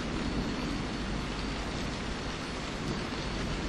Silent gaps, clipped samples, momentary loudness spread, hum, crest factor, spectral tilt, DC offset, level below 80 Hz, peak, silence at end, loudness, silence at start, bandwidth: none; under 0.1%; 3 LU; none; 14 dB; -5 dB/octave; under 0.1%; -40 dBFS; -20 dBFS; 0 s; -35 LUFS; 0 s; 12 kHz